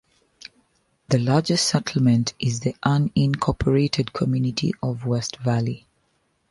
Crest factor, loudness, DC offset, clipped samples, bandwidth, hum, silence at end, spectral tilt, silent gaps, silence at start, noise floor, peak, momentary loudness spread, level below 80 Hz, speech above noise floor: 18 dB; -22 LUFS; under 0.1%; under 0.1%; 11.5 kHz; none; 0.75 s; -5.5 dB/octave; none; 1.1 s; -68 dBFS; -6 dBFS; 5 LU; -46 dBFS; 47 dB